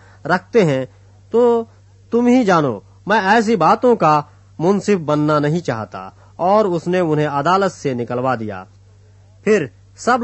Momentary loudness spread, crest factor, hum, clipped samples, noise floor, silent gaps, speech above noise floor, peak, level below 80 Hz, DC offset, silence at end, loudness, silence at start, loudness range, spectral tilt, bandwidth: 15 LU; 16 dB; none; under 0.1%; -46 dBFS; none; 31 dB; 0 dBFS; -56 dBFS; under 0.1%; 0 s; -17 LUFS; 0.25 s; 4 LU; -6.5 dB/octave; 8.4 kHz